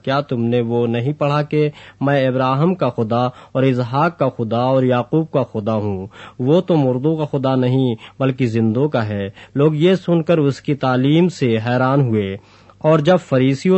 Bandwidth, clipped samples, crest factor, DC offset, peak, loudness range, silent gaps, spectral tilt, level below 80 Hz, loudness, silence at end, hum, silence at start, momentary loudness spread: 8.4 kHz; under 0.1%; 14 dB; under 0.1%; -2 dBFS; 2 LU; none; -8 dB/octave; -58 dBFS; -17 LUFS; 0 s; none; 0.05 s; 7 LU